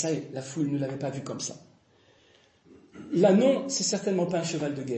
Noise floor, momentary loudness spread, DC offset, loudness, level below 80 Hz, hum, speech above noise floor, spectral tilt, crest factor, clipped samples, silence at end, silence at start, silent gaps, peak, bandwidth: -62 dBFS; 14 LU; under 0.1%; -27 LUFS; -72 dBFS; none; 35 dB; -5 dB/octave; 20 dB; under 0.1%; 0 s; 0 s; none; -10 dBFS; 8.8 kHz